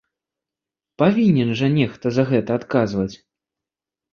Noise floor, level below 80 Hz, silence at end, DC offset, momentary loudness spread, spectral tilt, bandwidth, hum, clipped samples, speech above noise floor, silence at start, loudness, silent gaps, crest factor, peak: -88 dBFS; -54 dBFS; 1 s; under 0.1%; 6 LU; -8 dB/octave; 7 kHz; none; under 0.1%; 70 dB; 1 s; -19 LUFS; none; 18 dB; -2 dBFS